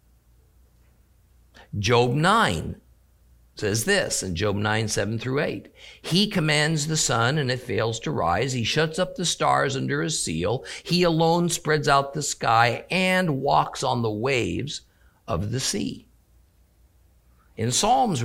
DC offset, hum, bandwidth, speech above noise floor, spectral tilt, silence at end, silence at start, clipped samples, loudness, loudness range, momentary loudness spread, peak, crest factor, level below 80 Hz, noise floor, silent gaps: under 0.1%; none; 16 kHz; 36 dB; -4 dB/octave; 0 s; 1.6 s; under 0.1%; -23 LUFS; 5 LU; 10 LU; -4 dBFS; 20 dB; -50 dBFS; -59 dBFS; none